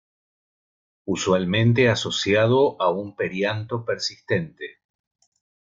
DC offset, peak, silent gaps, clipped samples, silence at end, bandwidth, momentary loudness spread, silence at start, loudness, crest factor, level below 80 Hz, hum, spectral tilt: under 0.1%; -6 dBFS; none; under 0.1%; 1.05 s; 7.6 kHz; 12 LU; 1.05 s; -22 LUFS; 18 dB; -58 dBFS; none; -5.5 dB/octave